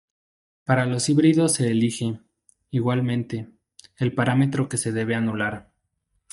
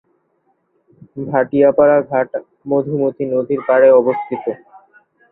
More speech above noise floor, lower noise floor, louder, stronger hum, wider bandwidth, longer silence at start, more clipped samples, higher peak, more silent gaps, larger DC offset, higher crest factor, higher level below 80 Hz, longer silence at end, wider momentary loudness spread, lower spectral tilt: about the same, 52 dB vs 49 dB; first, -73 dBFS vs -63 dBFS; second, -23 LUFS vs -15 LUFS; neither; first, 11.5 kHz vs 3.9 kHz; second, 0.7 s vs 1.15 s; neither; about the same, -4 dBFS vs -2 dBFS; neither; neither; about the same, 20 dB vs 16 dB; about the same, -62 dBFS vs -60 dBFS; about the same, 0.7 s vs 0.75 s; about the same, 14 LU vs 16 LU; second, -5.5 dB/octave vs -12 dB/octave